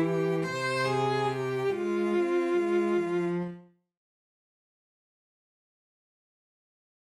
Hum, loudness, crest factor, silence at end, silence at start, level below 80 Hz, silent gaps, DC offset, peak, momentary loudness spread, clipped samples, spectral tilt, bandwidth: none; -28 LUFS; 14 dB; 3.5 s; 0 s; -74 dBFS; none; under 0.1%; -18 dBFS; 3 LU; under 0.1%; -6.5 dB/octave; 12 kHz